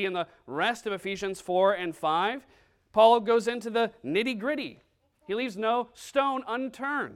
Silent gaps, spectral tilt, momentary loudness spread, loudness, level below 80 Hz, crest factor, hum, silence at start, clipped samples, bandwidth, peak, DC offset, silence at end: none; -4.5 dB/octave; 12 LU; -28 LUFS; -68 dBFS; 20 dB; none; 0 s; under 0.1%; 14.5 kHz; -8 dBFS; under 0.1%; 0 s